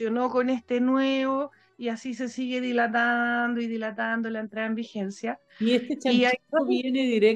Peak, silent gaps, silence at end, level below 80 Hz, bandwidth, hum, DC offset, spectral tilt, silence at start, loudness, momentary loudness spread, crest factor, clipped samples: -8 dBFS; none; 0 s; -74 dBFS; 8.8 kHz; none; under 0.1%; -5 dB/octave; 0 s; -26 LUFS; 10 LU; 16 dB; under 0.1%